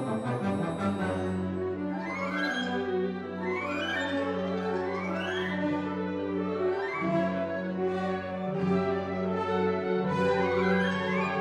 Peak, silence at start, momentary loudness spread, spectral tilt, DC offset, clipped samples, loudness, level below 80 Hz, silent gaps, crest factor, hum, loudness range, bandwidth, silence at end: -14 dBFS; 0 s; 6 LU; -7 dB/octave; under 0.1%; under 0.1%; -30 LUFS; -66 dBFS; none; 16 dB; none; 3 LU; 11 kHz; 0 s